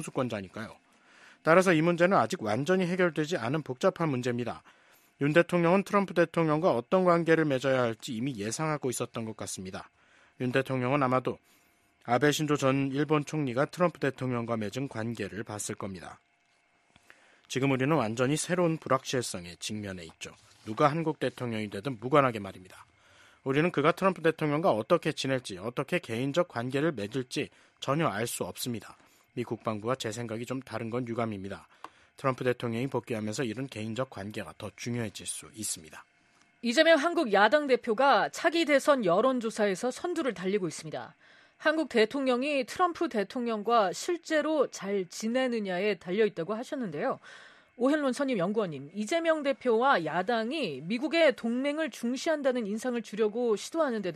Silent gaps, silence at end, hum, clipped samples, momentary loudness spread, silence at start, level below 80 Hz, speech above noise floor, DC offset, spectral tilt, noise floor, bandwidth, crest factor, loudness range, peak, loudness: none; 0 s; none; under 0.1%; 13 LU; 0 s; -70 dBFS; 40 dB; under 0.1%; -5 dB/octave; -69 dBFS; 13.5 kHz; 22 dB; 8 LU; -8 dBFS; -29 LUFS